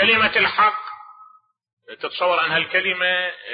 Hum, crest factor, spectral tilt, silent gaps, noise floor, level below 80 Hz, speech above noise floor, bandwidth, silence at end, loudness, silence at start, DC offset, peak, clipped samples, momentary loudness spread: none; 16 dB; -7.5 dB/octave; 1.73-1.77 s; -52 dBFS; -62 dBFS; 33 dB; 5.2 kHz; 0 s; -18 LUFS; 0 s; under 0.1%; -4 dBFS; under 0.1%; 16 LU